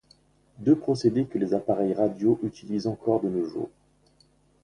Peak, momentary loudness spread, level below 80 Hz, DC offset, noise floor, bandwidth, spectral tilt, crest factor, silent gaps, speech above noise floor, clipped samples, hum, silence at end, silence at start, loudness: -8 dBFS; 7 LU; -62 dBFS; under 0.1%; -63 dBFS; 10 kHz; -8 dB/octave; 18 dB; none; 38 dB; under 0.1%; 50 Hz at -55 dBFS; 0.95 s; 0.6 s; -26 LUFS